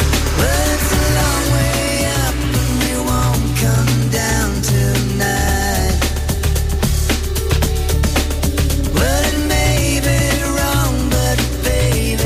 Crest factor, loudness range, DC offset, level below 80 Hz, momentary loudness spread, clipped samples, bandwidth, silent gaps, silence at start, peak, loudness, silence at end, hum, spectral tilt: 12 dB; 1 LU; under 0.1%; -20 dBFS; 3 LU; under 0.1%; 16 kHz; none; 0 s; -4 dBFS; -16 LUFS; 0 s; none; -4.5 dB/octave